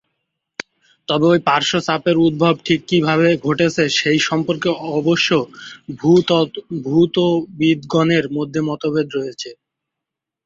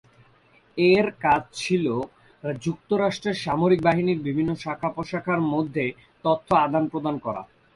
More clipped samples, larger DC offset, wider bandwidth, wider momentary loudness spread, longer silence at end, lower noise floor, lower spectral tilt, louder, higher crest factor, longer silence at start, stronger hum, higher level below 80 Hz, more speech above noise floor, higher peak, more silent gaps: neither; neither; second, 7.8 kHz vs 11.5 kHz; first, 16 LU vs 11 LU; first, 0.9 s vs 0.3 s; first, -83 dBFS vs -58 dBFS; about the same, -5.5 dB/octave vs -6.5 dB/octave; first, -17 LUFS vs -24 LUFS; about the same, 16 dB vs 18 dB; first, 1.1 s vs 0.75 s; neither; about the same, -56 dBFS vs -56 dBFS; first, 67 dB vs 35 dB; first, -2 dBFS vs -6 dBFS; neither